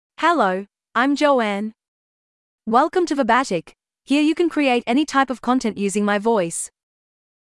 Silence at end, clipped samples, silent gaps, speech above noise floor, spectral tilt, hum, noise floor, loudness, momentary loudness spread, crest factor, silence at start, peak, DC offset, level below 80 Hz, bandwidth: 0.85 s; under 0.1%; 1.88-2.58 s; over 71 dB; -4 dB/octave; none; under -90 dBFS; -20 LUFS; 10 LU; 16 dB; 0.2 s; -4 dBFS; under 0.1%; -60 dBFS; 12 kHz